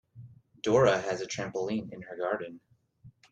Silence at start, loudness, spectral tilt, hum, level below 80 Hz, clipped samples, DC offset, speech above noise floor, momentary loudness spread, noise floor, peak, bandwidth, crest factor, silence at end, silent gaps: 0.15 s; -30 LUFS; -5 dB/octave; none; -66 dBFS; under 0.1%; under 0.1%; 28 dB; 12 LU; -58 dBFS; -12 dBFS; 9.2 kHz; 20 dB; 0.2 s; none